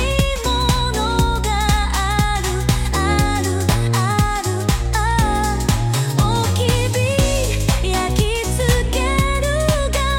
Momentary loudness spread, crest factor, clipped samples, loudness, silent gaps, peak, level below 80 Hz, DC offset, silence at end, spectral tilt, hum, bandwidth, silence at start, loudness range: 2 LU; 14 dB; under 0.1%; -18 LUFS; none; -4 dBFS; -22 dBFS; under 0.1%; 0 s; -4.5 dB/octave; none; 17 kHz; 0 s; 0 LU